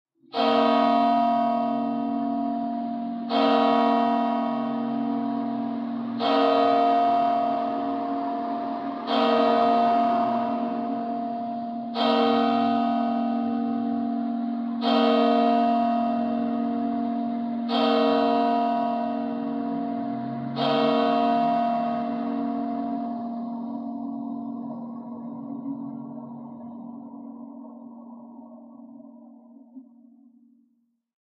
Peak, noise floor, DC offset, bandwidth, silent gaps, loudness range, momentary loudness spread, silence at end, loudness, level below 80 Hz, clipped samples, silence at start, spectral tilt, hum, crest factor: -8 dBFS; -69 dBFS; under 0.1%; 6 kHz; none; 13 LU; 16 LU; 1.45 s; -24 LUFS; -76 dBFS; under 0.1%; 0.35 s; -7 dB/octave; none; 16 dB